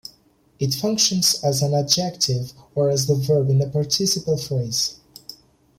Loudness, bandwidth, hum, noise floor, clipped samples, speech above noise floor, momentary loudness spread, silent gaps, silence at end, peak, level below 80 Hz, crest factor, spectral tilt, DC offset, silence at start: -20 LUFS; 16.5 kHz; none; -58 dBFS; under 0.1%; 37 dB; 11 LU; none; 0.45 s; -4 dBFS; -56 dBFS; 18 dB; -4.5 dB/octave; under 0.1%; 0.6 s